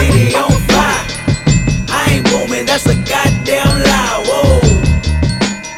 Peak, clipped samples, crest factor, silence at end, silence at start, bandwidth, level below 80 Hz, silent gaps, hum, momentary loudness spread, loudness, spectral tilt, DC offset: 0 dBFS; under 0.1%; 12 dB; 0 s; 0 s; 16.5 kHz; -20 dBFS; none; none; 4 LU; -12 LUFS; -5 dB/octave; under 0.1%